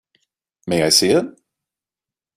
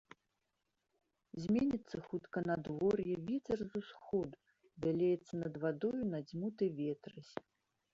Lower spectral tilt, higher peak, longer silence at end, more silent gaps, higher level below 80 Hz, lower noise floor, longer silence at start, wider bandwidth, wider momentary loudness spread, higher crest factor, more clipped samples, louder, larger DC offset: second, -3 dB/octave vs -7.5 dB/octave; first, -2 dBFS vs -22 dBFS; first, 1.05 s vs 0.55 s; neither; first, -58 dBFS vs -70 dBFS; first, -90 dBFS vs -86 dBFS; second, 0.65 s vs 1.35 s; first, 16 kHz vs 7.6 kHz; first, 20 LU vs 12 LU; about the same, 20 dB vs 16 dB; neither; first, -16 LUFS vs -39 LUFS; neither